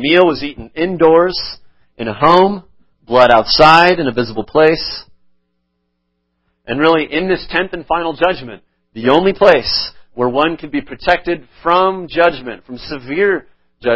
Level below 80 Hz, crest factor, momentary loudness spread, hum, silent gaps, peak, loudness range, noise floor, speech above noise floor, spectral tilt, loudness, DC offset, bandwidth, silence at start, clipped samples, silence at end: -42 dBFS; 14 dB; 16 LU; none; none; 0 dBFS; 6 LU; -68 dBFS; 55 dB; -6 dB/octave; -13 LUFS; under 0.1%; 8 kHz; 0 s; 0.2%; 0 s